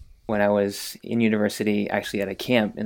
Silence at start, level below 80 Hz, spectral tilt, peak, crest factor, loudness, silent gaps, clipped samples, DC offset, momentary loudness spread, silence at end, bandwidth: 0 s; -56 dBFS; -5.5 dB/octave; -4 dBFS; 20 dB; -24 LUFS; none; under 0.1%; under 0.1%; 7 LU; 0 s; 18.5 kHz